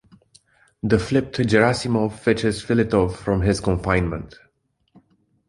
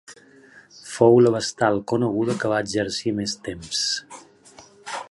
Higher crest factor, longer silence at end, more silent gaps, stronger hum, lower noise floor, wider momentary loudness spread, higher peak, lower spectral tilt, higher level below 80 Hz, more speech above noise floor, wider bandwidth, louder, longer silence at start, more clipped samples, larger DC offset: about the same, 20 dB vs 20 dB; first, 1.2 s vs 0.05 s; neither; neither; first, -67 dBFS vs -50 dBFS; second, 7 LU vs 18 LU; about the same, -2 dBFS vs -2 dBFS; first, -6.5 dB/octave vs -4.5 dB/octave; first, -38 dBFS vs -58 dBFS; first, 47 dB vs 29 dB; about the same, 11.5 kHz vs 11.5 kHz; about the same, -21 LUFS vs -21 LUFS; first, 0.85 s vs 0.1 s; neither; neither